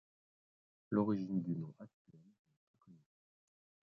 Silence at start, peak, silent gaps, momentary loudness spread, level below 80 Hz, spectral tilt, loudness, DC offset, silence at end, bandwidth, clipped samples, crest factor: 0.9 s; -20 dBFS; 1.93-2.05 s, 2.39-2.45 s, 2.57-2.74 s; 22 LU; -80 dBFS; -9.5 dB/octave; -39 LUFS; under 0.1%; 0.95 s; 6 kHz; under 0.1%; 24 dB